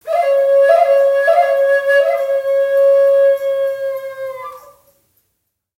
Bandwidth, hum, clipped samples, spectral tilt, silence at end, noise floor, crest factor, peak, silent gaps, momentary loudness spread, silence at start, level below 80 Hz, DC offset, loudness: 15.5 kHz; none; under 0.1%; -1 dB/octave; 1.2 s; -71 dBFS; 14 dB; 0 dBFS; none; 15 LU; 0.05 s; -66 dBFS; under 0.1%; -13 LUFS